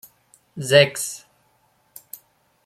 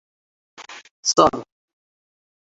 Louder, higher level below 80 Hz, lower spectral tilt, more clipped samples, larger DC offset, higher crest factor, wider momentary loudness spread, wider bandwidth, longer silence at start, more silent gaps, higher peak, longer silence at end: about the same, -19 LUFS vs -18 LUFS; second, -66 dBFS vs -56 dBFS; about the same, -3 dB/octave vs -2.5 dB/octave; neither; neither; about the same, 22 dB vs 24 dB; first, 26 LU vs 23 LU; first, 16 kHz vs 8.2 kHz; about the same, 0.55 s vs 0.6 s; second, none vs 0.91-1.03 s; about the same, -2 dBFS vs -2 dBFS; first, 1.5 s vs 1.1 s